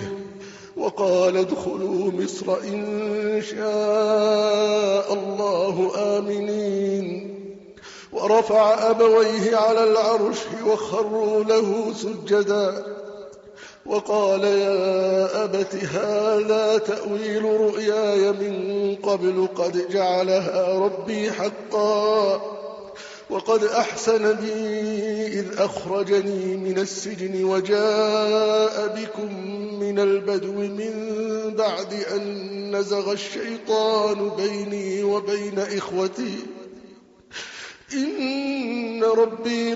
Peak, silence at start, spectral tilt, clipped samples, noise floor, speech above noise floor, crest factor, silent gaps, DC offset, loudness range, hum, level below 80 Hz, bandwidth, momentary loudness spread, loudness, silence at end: -6 dBFS; 0 s; -4 dB/octave; under 0.1%; -48 dBFS; 27 dB; 16 dB; none; under 0.1%; 6 LU; none; -66 dBFS; 8 kHz; 12 LU; -22 LUFS; 0 s